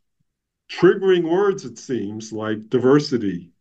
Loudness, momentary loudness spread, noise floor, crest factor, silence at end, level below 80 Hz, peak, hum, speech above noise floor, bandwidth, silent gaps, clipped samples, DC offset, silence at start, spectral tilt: -20 LUFS; 12 LU; -73 dBFS; 18 dB; 0.15 s; -66 dBFS; -2 dBFS; none; 54 dB; 8 kHz; none; under 0.1%; under 0.1%; 0.7 s; -6.5 dB/octave